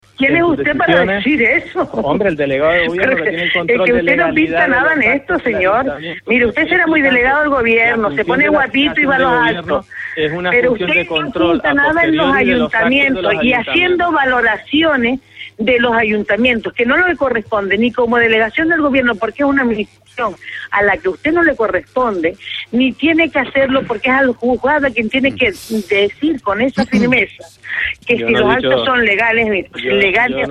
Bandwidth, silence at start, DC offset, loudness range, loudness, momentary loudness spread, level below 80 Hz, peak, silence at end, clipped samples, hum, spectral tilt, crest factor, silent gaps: 13 kHz; 0.2 s; under 0.1%; 3 LU; -13 LUFS; 7 LU; -42 dBFS; 0 dBFS; 0 s; under 0.1%; none; -6 dB/octave; 14 dB; none